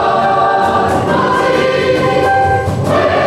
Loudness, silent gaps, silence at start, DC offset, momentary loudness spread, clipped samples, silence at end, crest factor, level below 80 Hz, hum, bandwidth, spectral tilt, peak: -12 LUFS; none; 0 s; under 0.1%; 2 LU; under 0.1%; 0 s; 10 dB; -40 dBFS; none; 14.5 kHz; -6 dB/octave; -2 dBFS